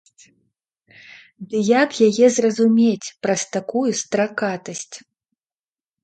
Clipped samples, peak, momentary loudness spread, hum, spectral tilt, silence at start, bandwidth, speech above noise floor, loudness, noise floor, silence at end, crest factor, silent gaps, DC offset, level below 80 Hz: under 0.1%; -2 dBFS; 16 LU; none; -4.5 dB/octave; 1.4 s; 9.2 kHz; over 71 dB; -19 LUFS; under -90 dBFS; 1.05 s; 18 dB; none; under 0.1%; -70 dBFS